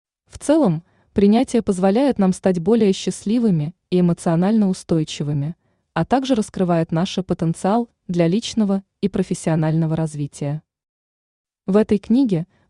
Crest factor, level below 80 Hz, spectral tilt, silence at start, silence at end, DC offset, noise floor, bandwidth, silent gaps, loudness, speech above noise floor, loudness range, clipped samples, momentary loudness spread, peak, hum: 16 dB; -52 dBFS; -7 dB/octave; 0.35 s; 0.25 s; under 0.1%; under -90 dBFS; 11 kHz; 10.89-11.44 s; -20 LUFS; over 72 dB; 4 LU; under 0.1%; 9 LU; -4 dBFS; none